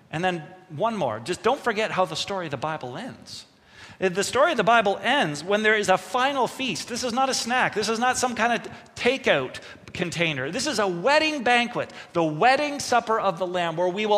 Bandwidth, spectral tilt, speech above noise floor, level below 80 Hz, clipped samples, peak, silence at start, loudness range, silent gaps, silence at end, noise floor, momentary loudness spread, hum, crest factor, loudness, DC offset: 15.5 kHz; -3.5 dB/octave; 24 dB; -62 dBFS; under 0.1%; -6 dBFS; 0.1 s; 5 LU; none; 0 s; -48 dBFS; 11 LU; none; 20 dB; -23 LUFS; under 0.1%